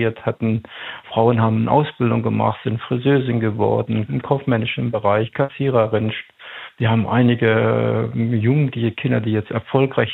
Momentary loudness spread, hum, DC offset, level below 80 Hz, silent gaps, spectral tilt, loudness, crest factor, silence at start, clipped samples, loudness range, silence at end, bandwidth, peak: 7 LU; none; under 0.1%; -56 dBFS; none; -10 dB/octave; -19 LUFS; 16 dB; 0 s; under 0.1%; 2 LU; 0 s; 4.1 kHz; -2 dBFS